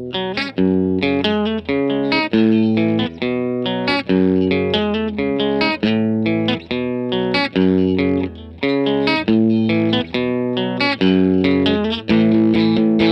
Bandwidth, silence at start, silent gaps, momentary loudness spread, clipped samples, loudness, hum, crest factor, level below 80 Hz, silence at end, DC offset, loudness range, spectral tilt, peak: 6.2 kHz; 0 s; none; 6 LU; under 0.1%; -17 LUFS; none; 14 dB; -48 dBFS; 0 s; under 0.1%; 2 LU; -8 dB/octave; -2 dBFS